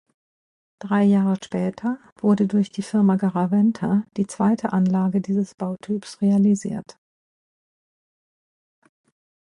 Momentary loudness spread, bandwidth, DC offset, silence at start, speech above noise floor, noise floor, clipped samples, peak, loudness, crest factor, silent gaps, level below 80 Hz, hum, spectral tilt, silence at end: 10 LU; 10.5 kHz; under 0.1%; 0.85 s; over 69 dB; under -90 dBFS; under 0.1%; -8 dBFS; -22 LUFS; 16 dB; 2.12-2.16 s, 5.54-5.58 s; -64 dBFS; none; -8 dB/octave; 2.7 s